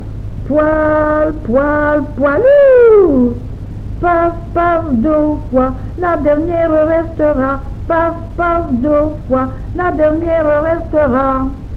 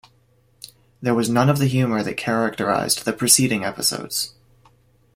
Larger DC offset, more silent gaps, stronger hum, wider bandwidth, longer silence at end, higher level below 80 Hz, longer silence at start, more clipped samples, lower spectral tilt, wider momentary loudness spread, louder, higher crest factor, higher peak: neither; neither; neither; second, 5.4 kHz vs 16.5 kHz; second, 0 s vs 0.85 s; first, -28 dBFS vs -56 dBFS; second, 0 s vs 1 s; neither; first, -9.5 dB/octave vs -4 dB/octave; about the same, 10 LU vs 10 LU; first, -13 LUFS vs -20 LUFS; second, 12 dB vs 22 dB; about the same, -2 dBFS vs 0 dBFS